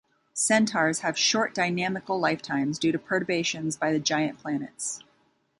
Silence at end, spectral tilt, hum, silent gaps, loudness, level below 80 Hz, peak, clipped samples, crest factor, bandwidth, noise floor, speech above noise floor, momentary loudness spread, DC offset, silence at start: 0.6 s; -3 dB/octave; none; none; -26 LUFS; -70 dBFS; -8 dBFS; under 0.1%; 20 dB; 11.5 kHz; -67 dBFS; 41 dB; 10 LU; under 0.1%; 0.35 s